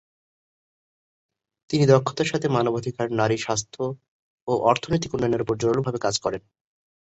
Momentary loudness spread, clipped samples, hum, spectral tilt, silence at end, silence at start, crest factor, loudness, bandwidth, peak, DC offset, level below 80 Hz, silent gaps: 12 LU; under 0.1%; none; -5.5 dB/octave; 0.6 s; 1.7 s; 20 dB; -23 LUFS; 8.2 kHz; -4 dBFS; under 0.1%; -54 dBFS; 4.08-4.47 s